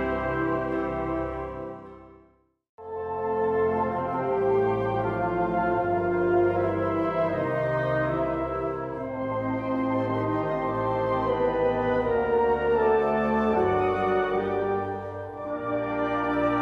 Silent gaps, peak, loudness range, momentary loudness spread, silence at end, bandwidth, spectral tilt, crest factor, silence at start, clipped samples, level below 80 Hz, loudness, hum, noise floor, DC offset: 2.69-2.78 s; -12 dBFS; 6 LU; 9 LU; 0 s; 6.6 kHz; -9 dB/octave; 14 dB; 0 s; under 0.1%; -48 dBFS; -26 LUFS; none; -61 dBFS; under 0.1%